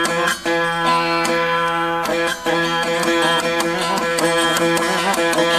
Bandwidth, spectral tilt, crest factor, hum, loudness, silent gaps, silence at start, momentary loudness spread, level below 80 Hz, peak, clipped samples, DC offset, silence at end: 16 kHz; -3 dB/octave; 14 dB; none; -17 LUFS; none; 0 s; 3 LU; -50 dBFS; -4 dBFS; under 0.1%; under 0.1%; 0 s